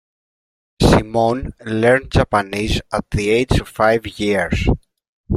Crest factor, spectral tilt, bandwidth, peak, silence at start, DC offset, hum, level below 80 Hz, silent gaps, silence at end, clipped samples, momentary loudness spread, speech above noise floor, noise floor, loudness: 18 dB; -6 dB/octave; 15.5 kHz; 0 dBFS; 0.8 s; under 0.1%; none; -30 dBFS; 5.08-5.24 s; 0 s; under 0.1%; 7 LU; over 73 dB; under -90 dBFS; -18 LUFS